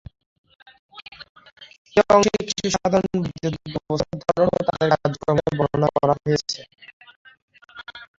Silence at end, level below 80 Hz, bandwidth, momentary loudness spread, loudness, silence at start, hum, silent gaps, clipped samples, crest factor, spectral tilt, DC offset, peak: 0.15 s; -50 dBFS; 8 kHz; 22 LU; -21 LUFS; 0.95 s; none; 1.29-1.35 s, 1.52-1.56 s, 1.78-1.85 s, 6.93-7.00 s, 7.16-7.25 s, 7.42-7.48 s; under 0.1%; 22 dB; -5.5 dB/octave; under 0.1%; -2 dBFS